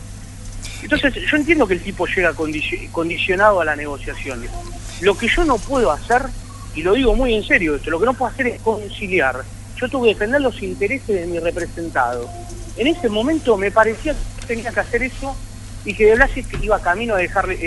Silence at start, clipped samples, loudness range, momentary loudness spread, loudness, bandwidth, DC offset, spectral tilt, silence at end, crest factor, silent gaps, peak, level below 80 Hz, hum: 0 s; under 0.1%; 3 LU; 15 LU; -18 LUFS; 11.5 kHz; under 0.1%; -5 dB/octave; 0 s; 18 dB; none; 0 dBFS; -30 dBFS; none